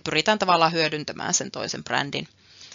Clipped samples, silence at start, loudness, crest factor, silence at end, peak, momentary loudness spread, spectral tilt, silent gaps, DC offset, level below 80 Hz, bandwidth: under 0.1%; 0.05 s; -23 LUFS; 20 dB; 0 s; -4 dBFS; 11 LU; -2 dB/octave; none; under 0.1%; -64 dBFS; 7.6 kHz